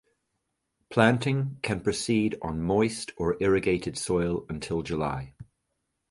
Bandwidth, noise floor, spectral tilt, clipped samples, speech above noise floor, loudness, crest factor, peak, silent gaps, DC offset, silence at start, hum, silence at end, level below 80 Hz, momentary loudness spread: 11.5 kHz; -80 dBFS; -5.5 dB/octave; under 0.1%; 53 dB; -27 LUFS; 24 dB; -4 dBFS; none; under 0.1%; 0.9 s; none; 0.65 s; -50 dBFS; 9 LU